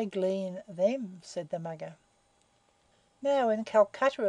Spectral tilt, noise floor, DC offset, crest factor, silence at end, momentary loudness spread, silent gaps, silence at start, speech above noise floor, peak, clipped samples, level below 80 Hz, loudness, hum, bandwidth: -6 dB/octave; -69 dBFS; under 0.1%; 20 dB; 0 s; 14 LU; none; 0 s; 39 dB; -12 dBFS; under 0.1%; -78 dBFS; -30 LUFS; none; 10 kHz